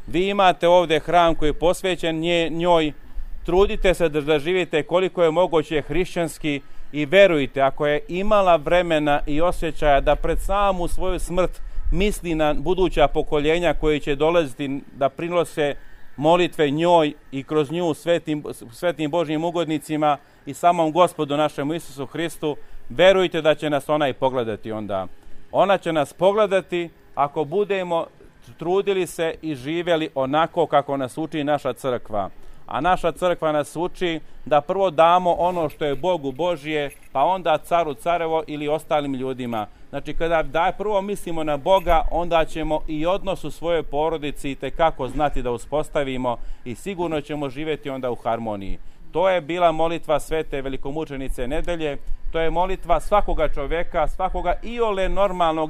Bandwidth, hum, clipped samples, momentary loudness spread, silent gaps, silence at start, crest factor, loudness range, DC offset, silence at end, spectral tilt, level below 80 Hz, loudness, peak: 14.5 kHz; none; under 0.1%; 11 LU; none; 0 s; 18 dB; 4 LU; under 0.1%; 0 s; -5.5 dB/octave; -32 dBFS; -22 LUFS; -2 dBFS